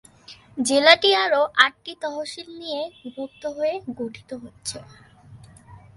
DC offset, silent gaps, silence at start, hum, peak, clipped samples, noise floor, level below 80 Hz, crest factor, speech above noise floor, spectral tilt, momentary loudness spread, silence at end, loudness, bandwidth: under 0.1%; none; 0.3 s; none; 0 dBFS; under 0.1%; -48 dBFS; -62 dBFS; 24 dB; 25 dB; -2 dB/octave; 20 LU; 0.2 s; -20 LUFS; 11.5 kHz